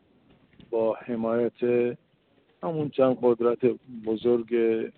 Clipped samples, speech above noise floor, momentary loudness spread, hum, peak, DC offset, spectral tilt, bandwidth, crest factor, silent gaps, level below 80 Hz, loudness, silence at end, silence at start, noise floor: under 0.1%; 39 dB; 9 LU; none; -10 dBFS; under 0.1%; -6.5 dB/octave; 4.3 kHz; 16 dB; none; -68 dBFS; -26 LUFS; 0.05 s; 0.7 s; -64 dBFS